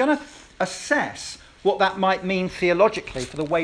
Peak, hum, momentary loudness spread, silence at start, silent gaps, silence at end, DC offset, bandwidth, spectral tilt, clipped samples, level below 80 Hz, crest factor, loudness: -4 dBFS; none; 11 LU; 0 s; none; 0 s; under 0.1%; 11 kHz; -4.5 dB/octave; under 0.1%; -52 dBFS; 18 dB; -23 LUFS